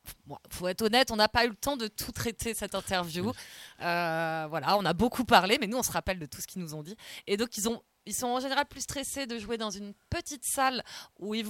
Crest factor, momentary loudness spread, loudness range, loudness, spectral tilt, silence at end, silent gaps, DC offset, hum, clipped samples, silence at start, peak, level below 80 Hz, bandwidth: 26 dB; 15 LU; 5 LU; -30 LUFS; -3 dB/octave; 0 s; none; under 0.1%; none; under 0.1%; 0.05 s; -6 dBFS; -54 dBFS; 17 kHz